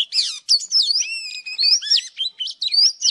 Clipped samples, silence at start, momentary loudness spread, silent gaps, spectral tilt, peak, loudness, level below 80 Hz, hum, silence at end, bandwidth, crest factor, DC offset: under 0.1%; 0 s; 10 LU; none; 7 dB/octave; -4 dBFS; -17 LUFS; -82 dBFS; none; 0 s; 15 kHz; 16 dB; under 0.1%